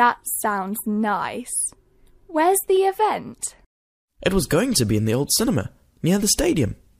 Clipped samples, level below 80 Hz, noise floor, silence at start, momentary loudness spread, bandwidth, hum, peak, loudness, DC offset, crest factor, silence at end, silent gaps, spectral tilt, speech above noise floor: under 0.1%; -42 dBFS; -52 dBFS; 0 s; 9 LU; 15.5 kHz; none; -4 dBFS; -21 LUFS; under 0.1%; 18 dB; 0.25 s; 3.66-4.08 s; -4 dB/octave; 32 dB